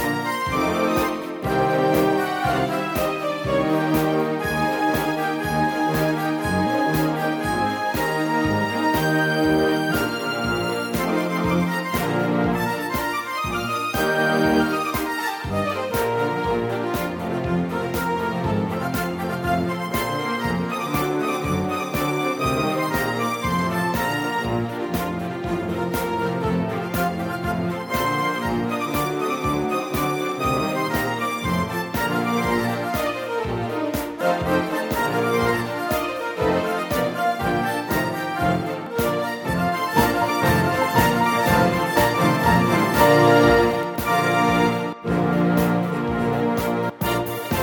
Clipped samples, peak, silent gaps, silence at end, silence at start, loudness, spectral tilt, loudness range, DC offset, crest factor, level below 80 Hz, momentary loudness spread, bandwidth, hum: under 0.1%; -4 dBFS; none; 0 s; 0 s; -22 LUFS; -5.5 dB/octave; 6 LU; under 0.1%; 18 dB; -42 dBFS; 6 LU; over 20 kHz; none